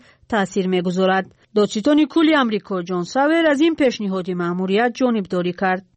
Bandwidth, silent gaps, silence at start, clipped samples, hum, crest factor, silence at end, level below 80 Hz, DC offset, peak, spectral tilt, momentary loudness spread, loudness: 8.8 kHz; none; 0.3 s; under 0.1%; none; 12 dB; 0.15 s; -58 dBFS; under 0.1%; -6 dBFS; -6 dB/octave; 8 LU; -19 LUFS